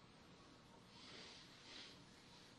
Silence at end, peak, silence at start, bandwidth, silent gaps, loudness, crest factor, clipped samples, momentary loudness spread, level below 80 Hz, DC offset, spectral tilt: 0 s; -44 dBFS; 0 s; 12 kHz; none; -60 LUFS; 18 dB; under 0.1%; 8 LU; -80 dBFS; under 0.1%; -3 dB/octave